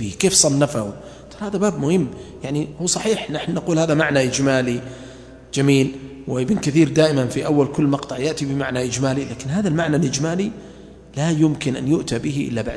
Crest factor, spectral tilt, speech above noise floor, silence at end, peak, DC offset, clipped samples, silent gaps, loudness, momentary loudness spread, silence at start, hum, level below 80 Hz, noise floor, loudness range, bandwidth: 20 dB; -5 dB/octave; 20 dB; 0 s; 0 dBFS; under 0.1%; under 0.1%; none; -20 LUFS; 12 LU; 0 s; none; -48 dBFS; -40 dBFS; 3 LU; 11 kHz